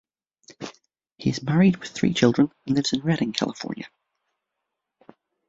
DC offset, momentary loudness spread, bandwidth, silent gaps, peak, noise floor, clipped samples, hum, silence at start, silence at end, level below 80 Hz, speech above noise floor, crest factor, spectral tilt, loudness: under 0.1%; 20 LU; 7.8 kHz; none; -4 dBFS; -82 dBFS; under 0.1%; none; 0.5 s; 1.6 s; -60 dBFS; 60 dB; 22 dB; -6 dB/octave; -23 LUFS